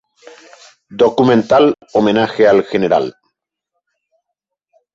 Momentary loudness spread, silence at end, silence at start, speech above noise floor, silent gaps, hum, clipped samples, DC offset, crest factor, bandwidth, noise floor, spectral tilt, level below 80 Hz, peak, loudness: 6 LU; 1.85 s; 0.9 s; 66 dB; none; none; under 0.1%; under 0.1%; 14 dB; 7.8 kHz; -78 dBFS; -6.5 dB/octave; -54 dBFS; 0 dBFS; -13 LUFS